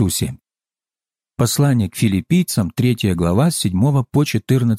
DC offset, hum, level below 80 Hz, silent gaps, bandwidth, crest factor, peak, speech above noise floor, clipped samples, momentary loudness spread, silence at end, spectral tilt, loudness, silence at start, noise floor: under 0.1%; none; -44 dBFS; none; 16 kHz; 12 dB; -4 dBFS; over 74 dB; under 0.1%; 4 LU; 0 s; -6 dB/octave; -17 LUFS; 0 s; under -90 dBFS